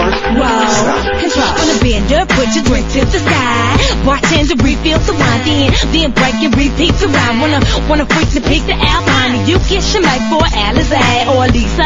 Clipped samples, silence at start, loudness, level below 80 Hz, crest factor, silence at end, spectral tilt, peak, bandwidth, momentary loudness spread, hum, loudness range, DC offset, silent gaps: under 0.1%; 0 s; -11 LUFS; -18 dBFS; 10 dB; 0 s; -4.5 dB/octave; 0 dBFS; 7.8 kHz; 2 LU; none; 1 LU; under 0.1%; none